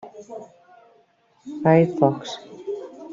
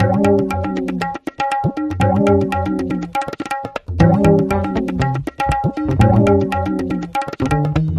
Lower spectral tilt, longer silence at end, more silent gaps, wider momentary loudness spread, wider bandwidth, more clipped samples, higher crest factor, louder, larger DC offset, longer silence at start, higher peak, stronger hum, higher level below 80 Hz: about the same, -7.5 dB/octave vs -8 dB/octave; about the same, 0 s vs 0 s; neither; first, 22 LU vs 10 LU; second, 7.6 kHz vs 13.5 kHz; neither; about the same, 20 dB vs 16 dB; second, -21 LUFS vs -17 LUFS; neither; about the same, 0.05 s vs 0 s; second, -4 dBFS vs 0 dBFS; neither; second, -66 dBFS vs -34 dBFS